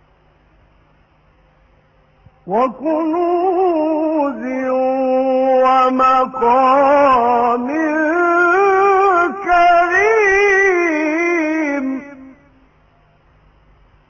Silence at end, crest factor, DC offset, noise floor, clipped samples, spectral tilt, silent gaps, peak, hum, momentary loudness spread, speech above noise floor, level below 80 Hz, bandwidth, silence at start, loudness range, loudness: 1.8 s; 12 dB; under 0.1%; -53 dBFS; under 0.1%; -4.5 dB/octave; none; -2 dBFS; none; 7 LU; 39 dB; -50 dBFS; 7.2 kHz; 2.45 s; 8 LU; -14 LUFS